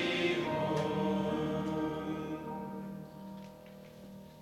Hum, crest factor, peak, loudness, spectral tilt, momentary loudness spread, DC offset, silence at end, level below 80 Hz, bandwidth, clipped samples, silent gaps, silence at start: none; 16 dB; -20 dBFS; -35 LUFS; -6 dB/octave; 19 LU; under 0.1%; 0 s; -64 dBFS; 16 kHz; under 0.1%; none; 0 s